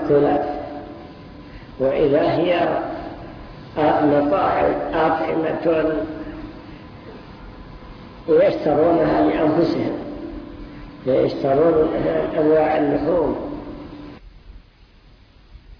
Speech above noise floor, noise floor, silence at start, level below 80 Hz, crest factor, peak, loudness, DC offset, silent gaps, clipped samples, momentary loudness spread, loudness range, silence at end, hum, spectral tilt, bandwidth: 31 dB; -49 dBFS; 0 s; -44 dBFS; 14 dB; -6 dBFS; -19 LUFS; under 0.1%; none; under 0.1%; 23 LU; 4 LU; 0.05 s; none; -9 dB/octave; 5.4 kHz